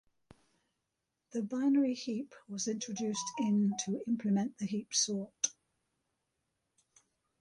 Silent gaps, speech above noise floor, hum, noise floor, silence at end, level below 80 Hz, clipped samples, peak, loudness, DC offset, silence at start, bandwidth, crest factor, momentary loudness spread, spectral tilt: none; 53 dB; none; -86 dBFS; 1.9 s; -80 dBFS; under 0.1%; -16 dBFS; -34 LUFS; under 0.1%; 1.35 s; 11.5 kHz; 20 dB; 9 LU; -4 dB/octave